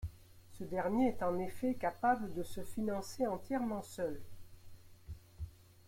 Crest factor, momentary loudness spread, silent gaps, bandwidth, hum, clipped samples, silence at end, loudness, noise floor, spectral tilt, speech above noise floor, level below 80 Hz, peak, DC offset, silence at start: 18 dB; 17 LU; none; 16.5 kHz; none; under 0.1%; 0.25 s; -37 LUFS; -57 dBFS; -6.5 dB/octave; 20 dB; -58 dBFS; -20 dBFS; under 0.1%; 0 s